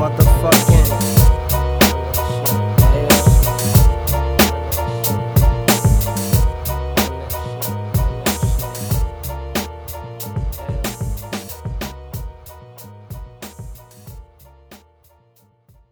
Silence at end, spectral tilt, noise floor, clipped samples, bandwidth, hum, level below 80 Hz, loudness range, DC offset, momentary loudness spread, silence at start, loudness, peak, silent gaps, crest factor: 1.15 s; -5 dB/octave; -56 dBFS; under 0.1%; over 20 kHz; none; -22 dBFS; 17 LU; under 0.1%; 19 LU; 0 s; -17 LUFS; 0 dBFS; none; 16 dB